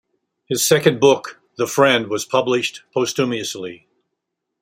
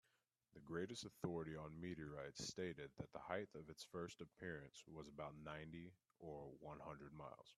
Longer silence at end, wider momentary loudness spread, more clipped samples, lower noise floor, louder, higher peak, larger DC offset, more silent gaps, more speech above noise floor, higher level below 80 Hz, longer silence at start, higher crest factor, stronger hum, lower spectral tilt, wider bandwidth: first, 0.85 s vs 0.05 s; first, 12 LU vs 9 LU; neither; second, -78 dBFS vs -86 dBFS; first, -18 LUFS vs -53 LUFS; first, 0 dBFS vs -30 dBFS; neither; neither; first, 60 dB vs 33 dB; first, -62 dBFS vs -76 dBFS; about the same, 0.5 s vs 0.55 s; second, 18 dB vs 24 dB; neither; second, -3.5 dB/octave vs -5 dB/octave; first, 16 kHz vs 13 kHz